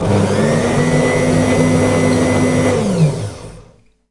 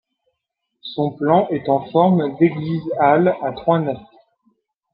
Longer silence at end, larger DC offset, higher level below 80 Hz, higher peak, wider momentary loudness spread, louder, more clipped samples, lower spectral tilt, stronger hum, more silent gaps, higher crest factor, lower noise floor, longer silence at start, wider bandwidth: second, 0.5 s vs 0.9 s; first, 0.4% vs under 0.1%; first, -36 dBFS vs -60 dBFS; about the same, 0 dBFS vs -2 dBFS; second, 3 LU vs 10 LU; first, -14 LUFS vs -18 LUFS; neither; second, -6 dB/octave vs -11 dB/octave; neither; neither; about the same, 14 dB vs 18 dB; second, -46 dBFS vs -77 dBFS; second, 0 s vs 0.85 s; first, 11.5 kHz vs 5 kHz